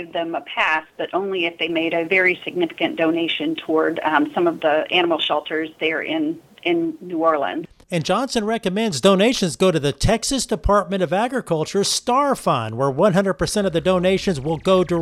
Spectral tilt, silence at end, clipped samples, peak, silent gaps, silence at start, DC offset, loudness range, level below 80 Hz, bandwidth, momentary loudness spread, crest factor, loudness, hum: -4.5 dB/octave; 0 s; under 0.1%; -2 dBFS; none; 0 s; under 0.1%; 2 LU; -40 dBFS; 15 kHz; 6 LU; 18 dB; -20 LUFS; none